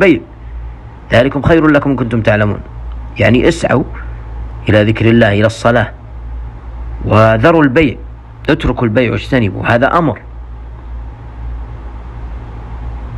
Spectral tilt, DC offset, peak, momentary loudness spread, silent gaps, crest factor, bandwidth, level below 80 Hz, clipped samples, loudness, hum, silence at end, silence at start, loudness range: -7 dB/octave; under 0.1%; 0 dBFS; 20 LU; none; 12 dB; 11 kHz; -26 dBFS; 0.3%; -11 LUFS; none; 0 s; 0 s; 5 LU